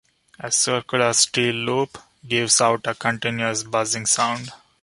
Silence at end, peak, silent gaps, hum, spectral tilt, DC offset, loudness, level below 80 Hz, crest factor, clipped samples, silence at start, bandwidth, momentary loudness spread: 0.25 s; -2 dBFS; none; none; -2 dB/octave; under 0.1%; -20 LUFS; -62 dBFS; 20 dB; under 0.1%; 0.4 s; 11.5 kHz; 8 LU